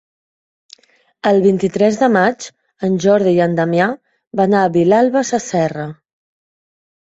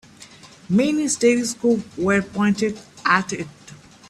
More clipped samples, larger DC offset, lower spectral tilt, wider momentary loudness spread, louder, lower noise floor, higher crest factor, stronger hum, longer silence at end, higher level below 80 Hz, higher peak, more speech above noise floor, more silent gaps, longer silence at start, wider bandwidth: neither; neither; first, -6 dB/octave vs -4.5 dB/octave; first, 13 LU vs 8 LU; first, -15 LUFS vs -20 LUFS; about the same, -47 dBFS vs -45 dBFS; second, 14 dB vs 20 dB; neither; first, 1.1 s vs 0.35 s; about the same, -58 dBFS vs -58 dBFS; about the same, -2 dBFS vs -2 dBFS; first, 34 dB vs 25 dB; first, 4.27-4.31 s vs none; first, 1.25 s vs 0.2 s; second, 8 kHz vs 13.5 kHz